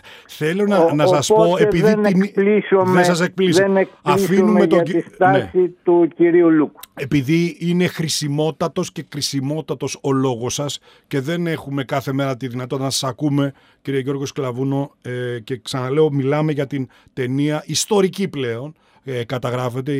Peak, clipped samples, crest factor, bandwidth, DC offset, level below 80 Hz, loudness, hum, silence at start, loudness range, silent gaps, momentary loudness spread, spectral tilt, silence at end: -4 dBFS; under 0.1%; 14 dB; 16 kHz; under 0.1%; -56 dBFS; -18 LUFS; none; 0.05 s; 7 LU; none; 11 LU; -5.5 dB/octave; 0 s